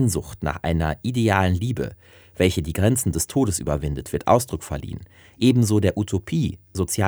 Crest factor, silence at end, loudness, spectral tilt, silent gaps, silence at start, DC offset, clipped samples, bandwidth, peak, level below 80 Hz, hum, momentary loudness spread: 20 dB; 0 s; -22 LUFS; -5.5 dB/octave; none; 0 s; under 0.1%; under 0.1%; over 20 kHz; -2 dBFS; -40 dBFS; none; 10 LU